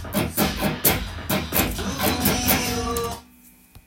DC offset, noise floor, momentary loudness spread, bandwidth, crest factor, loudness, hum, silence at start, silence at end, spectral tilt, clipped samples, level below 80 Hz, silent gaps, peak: under 0.1%; -51 dBFS; 7 LU; 17 kHz; 22 dB; -22 LUFS; none; 0 s; 0.05 s; -3.5 dB/octave; under 0.1%; -38 dBFS; none; -2 dBFS